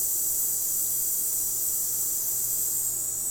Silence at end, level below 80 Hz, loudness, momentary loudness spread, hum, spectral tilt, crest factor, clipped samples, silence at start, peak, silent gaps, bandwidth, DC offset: 0 s; -58 dBFS; -24 LUFS; 1 LU; none; 0 dB/octave; 14 dB; under 0.1%; 0 s; -12 dBFS; none; over 20 kHz; under 0.1%